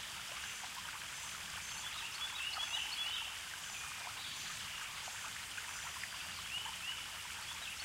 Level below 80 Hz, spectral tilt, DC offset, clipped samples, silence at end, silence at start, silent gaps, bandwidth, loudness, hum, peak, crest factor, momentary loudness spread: -68 dBFS; 0.5 dB/octave; under 0.1%; under 0.1%; 0 s; 0 s; none; 16 kHz; -42 LUFS; none; -28 dBFS; 16 dB; 6 LU